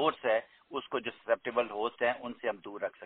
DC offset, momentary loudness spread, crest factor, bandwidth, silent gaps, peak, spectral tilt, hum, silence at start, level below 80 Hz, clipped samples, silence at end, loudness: under 0.1%; 8 LU; 20 dB; 4.3 kHz; none; -14 dBFS; -1.5 dB/octave; none; 0 s; -76 dBFS; under 0.1%; 0 s; -34 LUFS